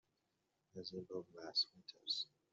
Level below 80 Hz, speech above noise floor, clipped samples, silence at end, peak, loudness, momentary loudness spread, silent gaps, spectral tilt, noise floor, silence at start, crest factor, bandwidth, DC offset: -90 dBFS; 39 dB; under 0.1%; 0.25 s; -28 dBFS; -44 LUFS; 13 LU; none; -2 dB/octave; -86 dBFS; 0.75 s; 20 dB; 8 kHz; under 0.1%